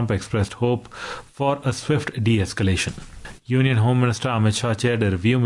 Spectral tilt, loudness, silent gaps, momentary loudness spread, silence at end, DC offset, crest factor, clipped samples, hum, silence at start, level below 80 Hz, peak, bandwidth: -6 dB/octave; -22 LUFS; none; 14 LU; 0 s; under 0.1%; 14 dB; under 0.1%; none; 0 s; -48 dBFS; -8 dBFS; 11.5 kHz